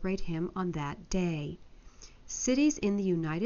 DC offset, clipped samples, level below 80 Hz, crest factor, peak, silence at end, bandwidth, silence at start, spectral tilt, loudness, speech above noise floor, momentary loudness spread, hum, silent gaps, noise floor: under 0.1%; under 0.1%; -48 dBFS; 14 dB; -18 dBFS; 0 s; 7.2 kHz; 0 s; -6.5 dB/octave; -32 LUFS; 21 dB; 12 LU; none; none; -52 dBFS